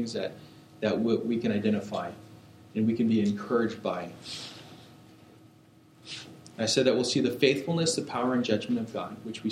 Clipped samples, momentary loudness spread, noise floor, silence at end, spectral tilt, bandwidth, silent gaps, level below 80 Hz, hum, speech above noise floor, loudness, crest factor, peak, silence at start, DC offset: under 0.1%; 16 LU; -57 dBFS; 0 s; -5 dB/octave; 15 kHz; none; -70 dBFS; none; 29 dB; -28 LUFS; 20 dB; -8 dBFS; 0 s; under 0.1%